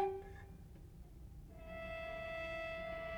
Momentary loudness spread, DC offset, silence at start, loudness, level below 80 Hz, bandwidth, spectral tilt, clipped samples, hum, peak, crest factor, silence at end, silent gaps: 15 LU; under 0.1%; 0 s; -46 LUFS; -56 dBFS; over 20 kHz; -6 dB/octave; under 0.1%; none; -26 dBFS; 20 dB; 0 s; none